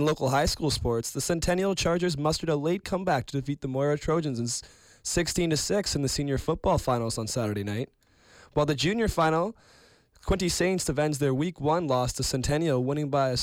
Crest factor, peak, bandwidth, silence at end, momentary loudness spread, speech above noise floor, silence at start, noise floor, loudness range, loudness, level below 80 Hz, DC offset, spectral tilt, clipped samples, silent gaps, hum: 14 dB; -14 dBFS; 16.5 kHz; 0 s; 6 LU; 29 dB; 0 s; -56 dBFS; 2 LU; -27 LUFS; -44 dBFS; under 0.1%; -4.5 dB/octave; under 0.1%; none; none